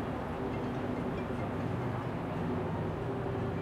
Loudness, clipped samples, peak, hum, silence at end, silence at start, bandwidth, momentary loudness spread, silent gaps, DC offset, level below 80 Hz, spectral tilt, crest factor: -36 LUFS; under 0.1%; -22 dBFS; none; 0 s; 0 s; 14.5 kHz; 2 LU; none; under 0.1%; -52 dBFS; -8.5 dB/octave; 12 dB